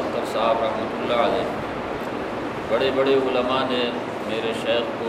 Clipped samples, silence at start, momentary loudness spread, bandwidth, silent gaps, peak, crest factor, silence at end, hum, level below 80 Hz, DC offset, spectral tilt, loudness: under 0.1%; 0 s; 8 LU; 15 kHz; none; -6 dBFS; 16 dB; 0 s; none; -50 dBFS; under 0.1%; -5 dB/octave; -23 LUFS